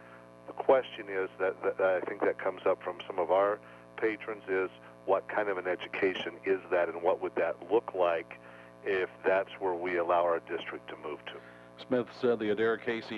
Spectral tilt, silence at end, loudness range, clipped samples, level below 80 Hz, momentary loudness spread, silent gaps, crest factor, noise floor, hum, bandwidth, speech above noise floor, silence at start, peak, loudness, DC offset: -6.5 dB/octave; 0 s; 2 LU; under 0.1%; -72 dBFS; 14 LU; none; 20 dB; -51 dBFS; 60 Hz at -55 dBFS; 11 kHz; 19 dB; 0 s; -12 dBFS; -32 LUFS; under 0.1%